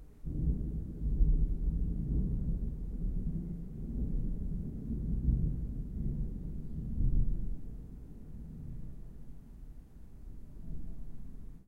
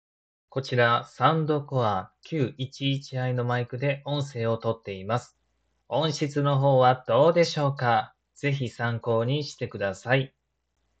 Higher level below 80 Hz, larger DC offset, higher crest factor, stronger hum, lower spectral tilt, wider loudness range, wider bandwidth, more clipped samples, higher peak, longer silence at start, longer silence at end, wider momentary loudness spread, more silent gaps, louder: first, -36 dBFS vs -68 dBFS; neither; about the same, 18 dB vs 20 dB; neither; first, -11.5 dB/octave vs -6.5 dB/octave; first, 14 LU vs 5 LU; second, 1.3 kHz vs 8.2 kHz; neither; second, -16 dBFS vs -6 dBFS; second, 0 s vs 0.55 s; second, 0.05 s vs 0.75 s; first, 19 LU vs 10 LU; neither; second, -38 LUFS vs -26 LUFS